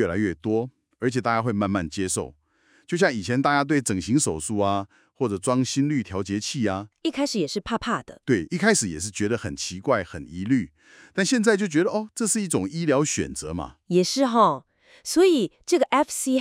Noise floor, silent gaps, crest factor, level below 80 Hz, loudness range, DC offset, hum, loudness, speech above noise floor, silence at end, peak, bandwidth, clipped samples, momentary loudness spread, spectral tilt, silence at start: -62 dBFS; none; 20 dB; -56 dBFS; 3 LU; under 0.1%; none; -24 LUFS; 38 dB; 0 s; -4 dBFS; 16 kHz; under 0.1%; 9 LU; -4.5 dB/octave; 0 s